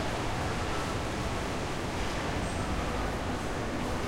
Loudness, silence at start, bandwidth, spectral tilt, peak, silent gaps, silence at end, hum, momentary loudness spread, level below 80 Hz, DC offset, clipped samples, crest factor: -33 LUFS; 0 s; 16.5 kHz; -5 dB/octave; -18 dBFS; none; 0 s; none; 1 LU; -40 dBFS; under 0.1%; under 0.1%; 14 dB